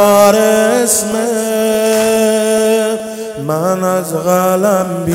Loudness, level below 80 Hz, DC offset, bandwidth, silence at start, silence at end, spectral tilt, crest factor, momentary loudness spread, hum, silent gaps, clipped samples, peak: -12 LUFS; -52 dBFS; under 0.1%; 17 kHz; 0 s; 0 s; -4 dB/octave; 12 dB; 8 LU; none; none; 0.3%; 0 dBFS